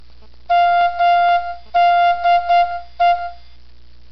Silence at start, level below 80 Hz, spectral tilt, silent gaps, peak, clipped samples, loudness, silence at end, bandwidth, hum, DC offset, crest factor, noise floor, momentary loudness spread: 0.5 s; -46 dBFS; -3.5 dB/octave; none; -8 dBFS; under 0.1%; -16 LUFS; 0.75 s; 6 kHz; 60 Hz at -50 dBFS; 1%; 8 dB; -47 dBFS; 7 LU